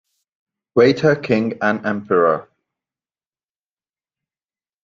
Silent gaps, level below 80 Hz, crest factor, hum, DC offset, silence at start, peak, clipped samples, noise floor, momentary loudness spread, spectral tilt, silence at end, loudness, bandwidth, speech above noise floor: none; -60 dBFS; 20 dB; none; under 0.1%; 0.75 s; -2 dBFS; under 0.1%; under -90 dBFS; 8 LU; -7 dB/octave; 2.4 s; -17 LUFS; 7.4 kHz; over 74 dB